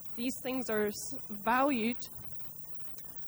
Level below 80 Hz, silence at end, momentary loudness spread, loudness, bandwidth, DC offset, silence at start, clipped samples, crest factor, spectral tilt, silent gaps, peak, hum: -66 dBFS; 0 s; 10 LU; -34 LUFS; over 20 kHz; under 0.1%; 0 s; under 0.1%; 18 dB; -4 dB/octave; none; -18 dBFS; none